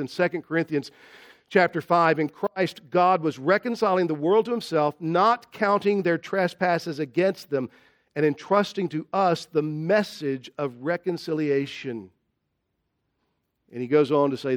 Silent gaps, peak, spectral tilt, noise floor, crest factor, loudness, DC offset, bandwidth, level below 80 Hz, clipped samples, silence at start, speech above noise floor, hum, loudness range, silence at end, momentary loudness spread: none; -6 dBFS; -6.5 dB/octave; -77 dBFS; 20 dB; -24 LUFS; under 0.1%; 18 kHz; -74 dBFS; under 0.1%; 0 s; 53 dB; none; 6 LU; 0 s; 9 LU